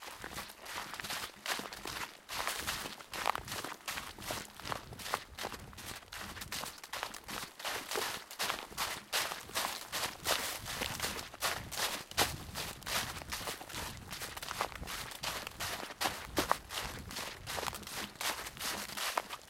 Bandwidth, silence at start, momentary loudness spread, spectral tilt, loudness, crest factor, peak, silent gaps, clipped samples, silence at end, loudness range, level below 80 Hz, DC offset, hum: 17 kHz; 0 s; 8 LU; -1.5 dB/octave; -38 LUFS; 32 dB; -8 dBFS; none; under 0.1%; 0 s; 5 LU; -58 dBFS; under 0.1%; none